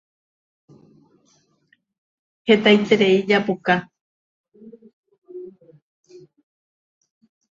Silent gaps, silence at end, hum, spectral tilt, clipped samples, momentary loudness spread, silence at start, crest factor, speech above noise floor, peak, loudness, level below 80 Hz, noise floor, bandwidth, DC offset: 4.01-4.44 s, 4.93-5.03 s, 5.18-5.22 s; 2.05 s; none; -6 dB/octave; under 0.1%; 24 LU; 2.45 s; 24 dB; 48 dB; 0 dBFS; -18 LUFS; -66 dBFS; -64 dBFS; 7.6 kHz; under 0.1%